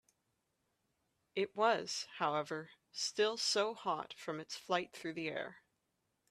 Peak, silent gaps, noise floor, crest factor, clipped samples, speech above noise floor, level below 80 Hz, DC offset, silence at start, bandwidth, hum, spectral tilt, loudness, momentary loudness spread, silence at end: -20 dBFS; none; -84 dBFS; 20 dB; under 0.1%; 46 dB; -84 dBFS; under 0.1%; 1.35 s; 14 kHz; none; -2.5 dB/octave; -38 LUFS; 11 LU; 0.7 s